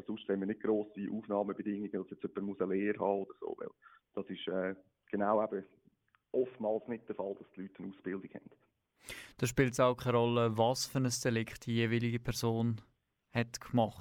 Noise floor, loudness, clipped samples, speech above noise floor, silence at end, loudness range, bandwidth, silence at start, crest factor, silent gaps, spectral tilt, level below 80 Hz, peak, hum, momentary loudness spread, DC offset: -72 dBFS; -35 LUFS; under 0.1%; 37 dB; 0 s; 8 LU; 17 kHz; 0.1 s; 20 dB; none; -5.5 dB/octave; -64 dBFS; -16 dBFS; none; 15 LU; under 0.1%